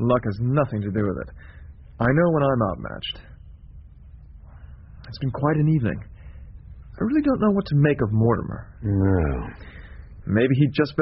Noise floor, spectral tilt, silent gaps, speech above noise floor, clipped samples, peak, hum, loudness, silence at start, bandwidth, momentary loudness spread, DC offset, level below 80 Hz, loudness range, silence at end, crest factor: -44 dBFS; -7 dB/octave; none; 23 dB; under 0.1%; -6 dBFS; none; -22 LUFS; 0 s; 5.6 kHz; 23 LU; under 0.1%; -40 dBFS; 5 LU; 0 s; 18 dB